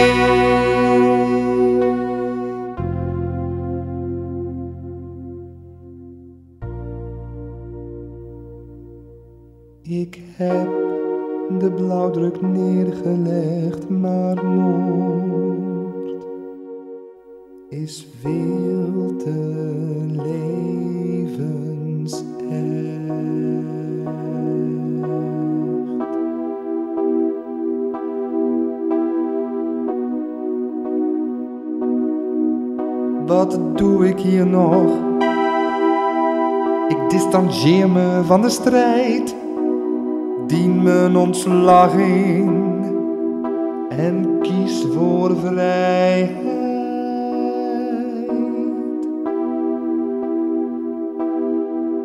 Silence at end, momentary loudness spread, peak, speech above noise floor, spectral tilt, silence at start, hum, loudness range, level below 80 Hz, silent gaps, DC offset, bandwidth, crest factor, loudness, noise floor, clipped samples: 0 s; 15 LU; -2 dBFS; 29 dB; -7 dB/octave; 0 s; none; 12 LU; -46 dBFS; none; under 0.1%; 13 kHz; 18 dB; -19 LUFS; -45 dBFS; under 0.1%